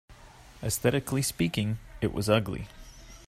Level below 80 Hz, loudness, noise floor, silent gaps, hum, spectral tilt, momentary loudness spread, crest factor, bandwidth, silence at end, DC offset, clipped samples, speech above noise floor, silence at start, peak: -48 dBFS; -29 LUFS; -51 dBFS; none; none; -5 dB/octave; 12 LU; 20 dB; 16 kHz; 0 s; under 0.1%; under 0.1%; 23 dB; 0.1 s; -10 dBFS